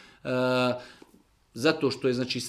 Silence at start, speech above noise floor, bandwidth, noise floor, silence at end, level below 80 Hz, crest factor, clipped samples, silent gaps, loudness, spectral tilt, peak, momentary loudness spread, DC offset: 0.25 s; 34 dB; 15 kHz; -61 dBFS; 0 s; -66 dBFS; 20 dB; under 0.1%; none; -27 LUFS; -5 dB/octave; -10 dBFS; 9 LU; under 0.1%